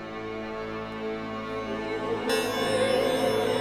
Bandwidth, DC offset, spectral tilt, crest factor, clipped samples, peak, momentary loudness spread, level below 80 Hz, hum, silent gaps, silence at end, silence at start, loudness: 14.5 kHz; under 0.1%; -4 dB/octave; 14 dB; under 0.1%; -14 dBFS; 10 LU; -54 dBFS; none; none; 0 s; 0 s; -28 LUFS